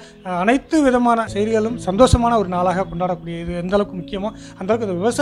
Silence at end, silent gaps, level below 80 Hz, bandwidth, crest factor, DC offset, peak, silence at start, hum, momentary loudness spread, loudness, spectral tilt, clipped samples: 0 s; none; -34 dBFS; 12.5 kHz; 18 dB; under 0.1%; 0 dBFS; 0 s; none; 12 LU; -19 LUFS; -6 dB/octave; under 0.1%